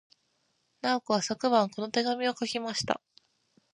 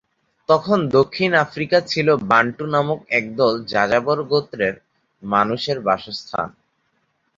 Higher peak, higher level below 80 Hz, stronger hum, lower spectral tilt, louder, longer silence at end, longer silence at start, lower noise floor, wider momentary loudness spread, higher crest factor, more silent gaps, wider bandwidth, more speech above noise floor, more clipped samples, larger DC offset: second, -10 dBFS vs -2 dBFS; second, -72 dBFS vs -58 dBFS; neither; second, -3.5 dB/octave vs -6 dB/octave; second, -29 LUFS vs -19 LUFS; second, 0.75 s vs 0.9 s; first, 0.85 s vs 0.5 s; first, -74 dBFS vs -68 dBFS; second, 7 LU vs 10 LU; about the same, 22 dB vs 18 dB; neither; first, 11 kHz vs 7.6 kHz; second, 45 dB vs 49 dB; neither; neither